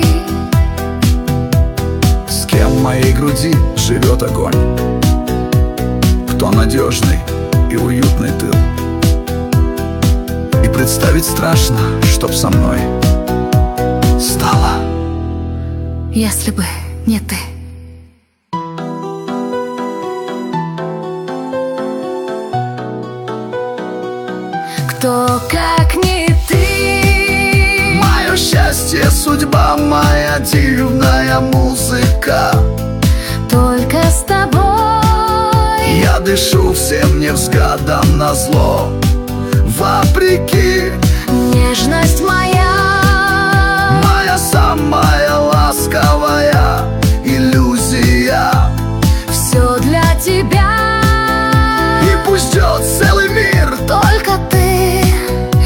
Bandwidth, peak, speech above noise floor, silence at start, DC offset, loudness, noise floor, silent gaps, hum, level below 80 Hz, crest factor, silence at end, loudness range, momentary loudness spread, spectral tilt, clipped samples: 18.5 kHz; 0 dBFS; 35 dB; 0 s; under 0.1%; -12 LUFS; -46 dBFS; none; none; -18 dBFS; 12 dB; 0 s; 9 LU; 10 LU; -5 dB/octave; under 0.1%